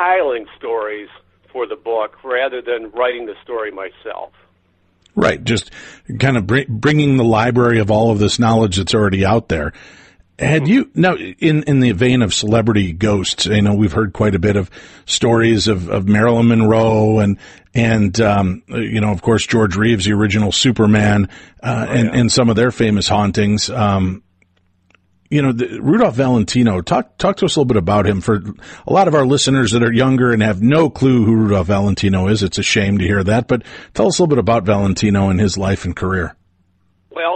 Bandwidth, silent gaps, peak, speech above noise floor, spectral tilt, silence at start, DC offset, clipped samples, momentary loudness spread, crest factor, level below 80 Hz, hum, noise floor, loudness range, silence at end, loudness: 8.8 kHz; none; -2 dBFS; 44 dB; -5.5 dB/octave; 0 s; under 0.1%; under 0.1%; 10 LU; 12 dB; -40 dBFS; none; -59 dBFS; 6 LU; 0 s; -15 LUFS